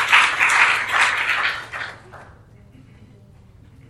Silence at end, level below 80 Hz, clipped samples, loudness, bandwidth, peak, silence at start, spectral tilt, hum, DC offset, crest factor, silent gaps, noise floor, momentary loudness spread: 1.65 s; -54 dBFS; under 0.1%; -16 LUFS; 16.5 kHz; 0 dBFS; 0 s; 0 dB/octave; none; under 0.1%; 20 dB; none; -47 dBFS; 17 LU